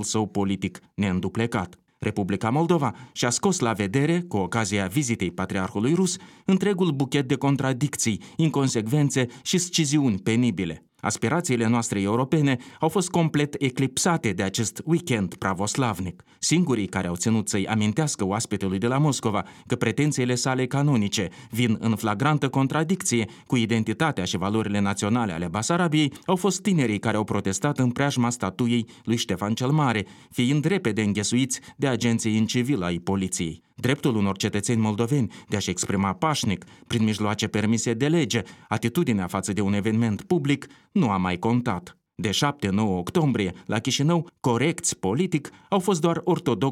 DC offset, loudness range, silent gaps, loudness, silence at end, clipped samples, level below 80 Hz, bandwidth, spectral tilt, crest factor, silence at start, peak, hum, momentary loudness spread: under 0.1%; 1 LU; none; -24 LUFS; 0 s; under 0.1%; -58 dBFS; 16 kHz; -5 dB/octave; 16 dB; 0 s; -8 dBFS; none; 5 LU